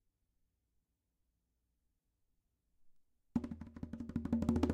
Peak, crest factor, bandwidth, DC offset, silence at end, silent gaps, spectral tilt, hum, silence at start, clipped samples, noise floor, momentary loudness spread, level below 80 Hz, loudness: -20 dBFS; 24 dB; 10.5 kHz; under 0.1%; 0 s; none; -8 dB/octave; none; 2.85 s; under 0.1%; -84 dBFS; 14 LU; -56 dBFS; -41 LUFS